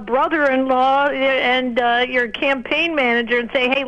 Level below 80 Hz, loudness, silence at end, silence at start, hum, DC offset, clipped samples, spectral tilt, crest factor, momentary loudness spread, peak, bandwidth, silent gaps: -50 dBFS; -17 LUFS; 0 s; 0 s; none; under 0.1%; under 0.1%; -4.5 dB/octave; 14 dB; 3 LU; -2 dBFS; 8.8 kHz; none